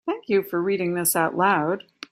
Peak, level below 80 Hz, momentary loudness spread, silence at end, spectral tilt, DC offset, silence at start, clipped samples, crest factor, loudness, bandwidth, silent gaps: -6 dBFS; -68 dBFS; 5 LU; 0.35 s; -4 dB/octave; under 0.1%; 0.05 s; under 0.1%; 16 dB; -23 LUFS; 16 kHz; none